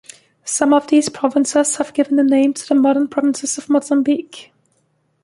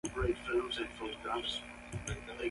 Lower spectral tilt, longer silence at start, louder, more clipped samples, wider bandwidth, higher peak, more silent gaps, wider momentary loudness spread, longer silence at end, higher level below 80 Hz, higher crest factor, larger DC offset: about the same, -3 dB/octave vs -4 dB/octave; first, 0.45 s vs 0.05 s; first, -16 LUFS vs -38 LUFS; neither; about the same, 11.5 kHz vs 11.5 kHz; first, -2 dBFS vs -22 dBFS; neither; about the same, 8 LU vs 7 LU; first, 0.8 s vs 0 s; second, -64 dBFS vs -50 dBFS; about the same, 16 dB vs 16 dB; neither